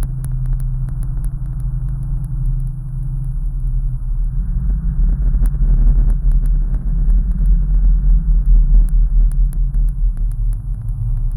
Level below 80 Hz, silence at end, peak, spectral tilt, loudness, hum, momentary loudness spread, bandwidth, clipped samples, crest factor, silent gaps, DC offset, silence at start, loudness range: -14 dBFS; 0 s; -2 dBFS; -9.5 dB/octave; -20 LUFS; none; 8 LU; 1.6 kHz; under 0.1%; 12 dB; none; under 0.1%; 0 s; 6 LU